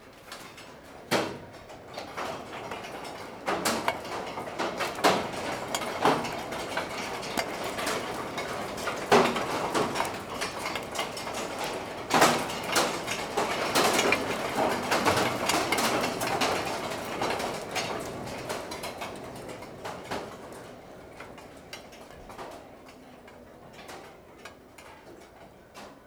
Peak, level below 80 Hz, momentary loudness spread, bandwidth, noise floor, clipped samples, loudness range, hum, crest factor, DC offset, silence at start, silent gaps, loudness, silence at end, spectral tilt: -6 dBFS; -58 dBFS; 22 LU; over 20 kHz; -51 dBFS; under 0.1%; 19 LU; none; 26 dB; under 0.1%; 0 s; none; -29 LUFS; 0 s; -3 dB/octave